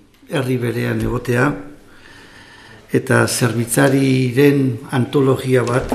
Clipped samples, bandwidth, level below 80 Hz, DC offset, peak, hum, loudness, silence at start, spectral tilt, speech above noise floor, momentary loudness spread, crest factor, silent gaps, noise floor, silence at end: under 0.1%; 15.5 kHz; -42 dBFS; under 0.1%; 0 dBFS; none; -17 LUFS; 0.3 s; -6 dB/octave; 26 dB; 8 LU; 16 dB; none; -42 dBFS; 0 s